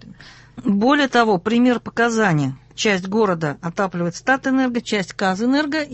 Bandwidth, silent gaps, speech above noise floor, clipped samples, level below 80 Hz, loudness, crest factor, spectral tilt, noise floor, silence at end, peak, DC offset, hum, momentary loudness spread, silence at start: 8.4 kHz; none; 24 dB; under 0.1%; -54 dBFS; -19 LUFS; 18 dB; -5.5 dB/octave; -43 dBFS; 0 s; -2 dBFS; under 0.1%; none; 7 LU; 0.05 s